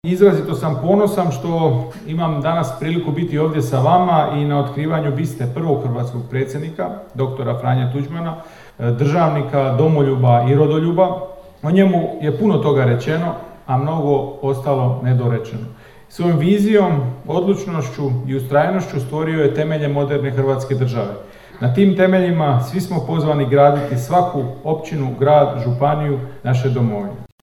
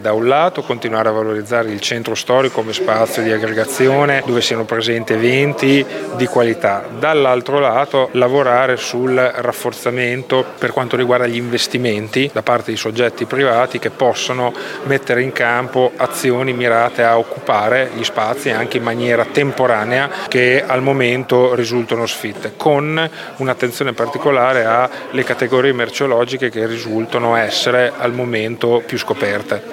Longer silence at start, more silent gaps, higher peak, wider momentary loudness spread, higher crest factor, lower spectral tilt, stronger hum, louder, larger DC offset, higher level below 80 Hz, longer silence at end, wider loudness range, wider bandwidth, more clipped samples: about the same, 0.05 s vs 0 s; neither; about the same, 0 dBFS vs -2 dBFS; first, 10 LU vs 6 LU; about the same, 16 dB vs 14 dB; first, -8 dB/octave vs -4.5 dB/octave; neither; about the same, -17 LUFS vs -16 LUFS; neither; first, -50 dBFS vs -64 dBFS; first, 0.15 s vs 0 s; about the same, 4 LU vs 2 LU; second, 13 kHz vs 17 kHz; neither